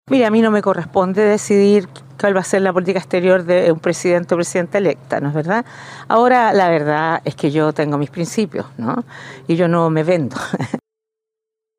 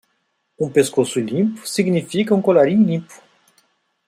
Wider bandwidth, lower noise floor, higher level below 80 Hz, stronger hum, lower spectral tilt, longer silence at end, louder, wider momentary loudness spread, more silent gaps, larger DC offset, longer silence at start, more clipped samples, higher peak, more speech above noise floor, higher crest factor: about the same, 15 kHz vs 15 kHz; first, -83 dBFS vs -69 dBFS; about the same, -64 dBFS vs -64 dBFS; neither; about the same, -6 dB/octave vs -6 dB/octave; about the same, 1 s vs 0.9 s; about the same, -16 LUFS vs -18 LUFS; first, 10 LU vs 7 LU; neither; neither; second, 0.05 s vs 0.6 s; neither; about the same, -2 dBFS vs -2 dBFS; first, 67 dB vs 52 dB; about the same, 16 dB vs 18 dB